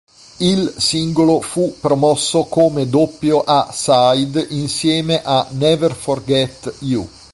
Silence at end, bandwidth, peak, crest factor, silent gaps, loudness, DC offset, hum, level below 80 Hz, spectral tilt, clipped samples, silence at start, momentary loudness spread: 0.25 s; 11.5 kHz; -2 dBFS; 14 dB; none; -16 LUFS; under 0.1%; none; -48 dBFS; -5 dB/octave; under 0.1%; 0.4 s; 7 LU